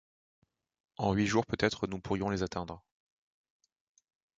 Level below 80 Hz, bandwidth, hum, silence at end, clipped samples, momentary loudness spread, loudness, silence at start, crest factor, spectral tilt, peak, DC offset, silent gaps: -56 dBFS; 7.8 kHz; none; 1.6 s; under 0.1%; 15 LU; -33 LUFS; 1 s; 24 dB; -5.5 dB/octave; -12 dBFS; under 0.1%; none